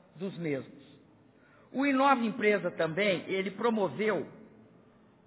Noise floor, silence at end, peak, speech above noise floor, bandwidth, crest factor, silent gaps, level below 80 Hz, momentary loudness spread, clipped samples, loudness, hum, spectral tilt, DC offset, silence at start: -61 dBFS; 0.85 s; -12 dBFS; 31 dB; 4 kHz; 20 dB; none; -78 dBFS; 13 LU; under 0.1%; -30 LUFS; none; -4 dB/octave; under 0.1%; 0.15 s